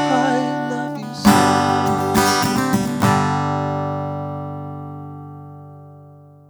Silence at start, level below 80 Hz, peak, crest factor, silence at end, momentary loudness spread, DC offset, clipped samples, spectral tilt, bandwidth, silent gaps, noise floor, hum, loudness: 0 s; -48 dBFS; 0 dBFS; 20 dB; 0.3 s; 19 LU; under 0.1%; under 0.1%; -5 dB/octave; over 20 kHz; none; -44 dBFS; 50 Hz at -55 dBFS; -18 LUFS